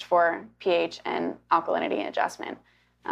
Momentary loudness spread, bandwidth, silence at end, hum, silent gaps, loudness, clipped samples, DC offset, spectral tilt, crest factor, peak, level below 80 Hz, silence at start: 15 LU; 12.5 kHz; 0 s; 60 Hz at -55 dBFS; none; -27 LUFS; under 0.1%; under 0.1%; -4.5 dB/octave; 18 dB; -8 dBFS; -70 dBFS; 0 s